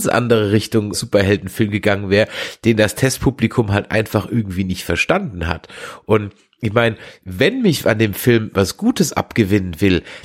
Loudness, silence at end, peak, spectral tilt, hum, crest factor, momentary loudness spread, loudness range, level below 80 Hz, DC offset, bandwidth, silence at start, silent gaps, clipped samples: -17 LUFS; 0.05 s; 0 dBFS; -5.5 dB/octave; none; 16 dB; 7 LU; 3 LU; -40 dBFS; under 0.1%; 16.5 kHz; 0 s; none; under 0.1%